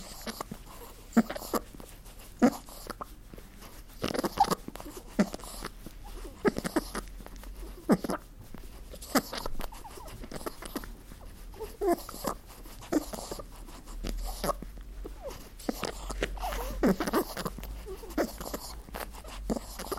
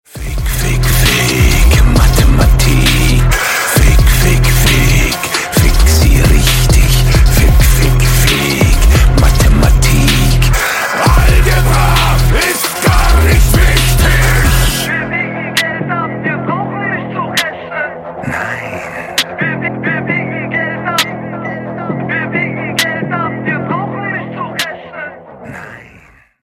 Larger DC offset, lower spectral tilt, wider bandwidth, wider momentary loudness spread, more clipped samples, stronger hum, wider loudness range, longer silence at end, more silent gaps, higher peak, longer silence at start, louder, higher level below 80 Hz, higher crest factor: neither; about the same, -5 dB/octave vs -4.5 dB/octave; about the same, 16.5 kHz vs 17 kHz; first, 20 LU vs 10 LU; neither; neither; about the same, 5 LU vs 7 LU; second, 0 s vs 0.6 s; neither; second, -8 dBFS vs 0 dBFS; second, 0 s vs 0.15 s; second, -34 LUFS vs -12 LUFS; second, -44 dBFS vs -14 dBFS; first, 26 dB vs 10 dB